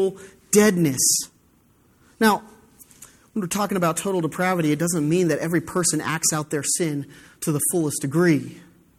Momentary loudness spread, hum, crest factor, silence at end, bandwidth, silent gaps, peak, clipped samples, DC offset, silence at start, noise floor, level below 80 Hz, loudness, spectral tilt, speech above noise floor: 9 LU; none; 18 dB; 0.35 s; 16.5 kHz; none; -4 dBFS; under 0.1%; under 0.1%; 0 s; -59 dBFS; -60 dBFS; -21 LUFS; -4 dB/octave; 37 dB